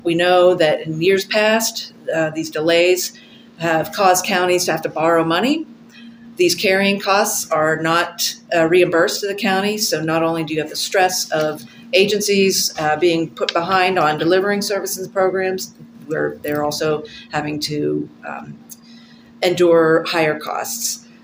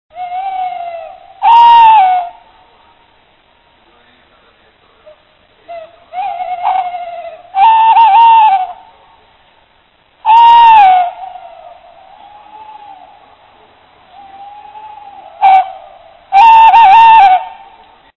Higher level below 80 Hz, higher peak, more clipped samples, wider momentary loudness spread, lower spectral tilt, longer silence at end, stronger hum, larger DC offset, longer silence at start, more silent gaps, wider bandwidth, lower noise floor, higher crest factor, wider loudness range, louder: second, -60 dBFS vs -54 dBFS; about the same, 0 dBFS vs 0 dBFS; second, under 0.1% vs 0.7%; second, 10 LU vs 24 LU; first, -3.5 dB/octave vs -2 dB/octave; second, 0.25 s vs 0.65 s; neither; neither; about the same, 0.05 s vs 0.15 s; neither; first, 16 kHz vs 7 kHz; second, -43 dBFS vs -51 dBFS; first, 18 dB vs 10 dB; second, 5 LU vs 14 LU; second, -17 LUFS vs -7 LUFS